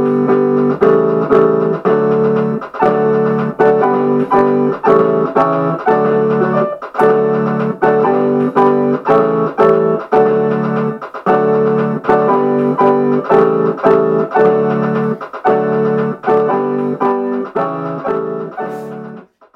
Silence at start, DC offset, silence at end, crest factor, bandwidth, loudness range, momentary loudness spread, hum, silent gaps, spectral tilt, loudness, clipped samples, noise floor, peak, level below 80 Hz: 0 s; under 0.1%; 0.35 s; 12 dB; 6 kHz; 3 LU; 7 LU; none; none; -9.5 dB/octave; -13 LUFS; under 0.1%; -34 dBFS; 0 dBFS; -54 dBFS